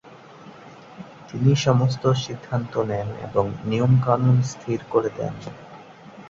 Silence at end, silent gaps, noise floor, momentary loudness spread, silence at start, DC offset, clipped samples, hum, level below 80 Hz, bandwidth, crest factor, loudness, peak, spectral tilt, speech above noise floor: 0 s; none; -44 dBFS; 23 LU; 0.05 s; under 0.1%; under 0.1%; none; -54 dBFS; 7.6 kHz; 18 dB; -22 LUFS; -4 dBFS; -7 dB/octave; 23 dB